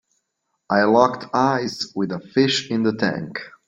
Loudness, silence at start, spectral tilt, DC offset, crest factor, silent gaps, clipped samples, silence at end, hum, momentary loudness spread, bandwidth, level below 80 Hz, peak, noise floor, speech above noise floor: -20 LUFS; 0.7 s; -5 dB/octave; under 0.1%; 20 dB; none; under 0.1%; 0.2 s; none; 10 LU; 9.4 kHz; -62 dBFS; 0 dBFS; -75 dBFS; 55 dB